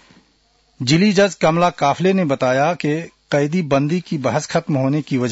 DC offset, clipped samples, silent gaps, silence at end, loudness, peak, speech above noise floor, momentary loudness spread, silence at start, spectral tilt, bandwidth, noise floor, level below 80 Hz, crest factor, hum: under 0.1%; under 0.1%; none; 0 s; -18 LUFS; -4 dBFS; 42 dB; 6 LU; 0.8 s; -6 dB/octave; 8 kHz; -59 dBFS; -58 dBFS; 14 dB; none